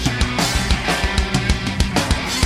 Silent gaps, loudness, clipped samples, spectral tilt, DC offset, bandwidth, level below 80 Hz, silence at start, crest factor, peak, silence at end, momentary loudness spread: none; -19 LUFS; under 0.1%; -4 dB/octave; under 0.1%; 16 kHz; -24 dBFS; 0 s; 18 dB; 0 dBFS; 0 s; 2 LU